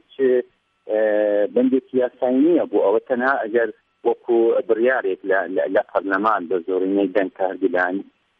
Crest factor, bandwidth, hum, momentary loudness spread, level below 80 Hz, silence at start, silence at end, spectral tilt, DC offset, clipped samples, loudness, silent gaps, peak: 14 dB; 4.9 kHz; none; 6 LU; -72 dBFS; 0.2 s; 0.4 s; -8.5 dB/octave; under 0.1%; under 0.1%; -20 LUFS; none; -6 dBFS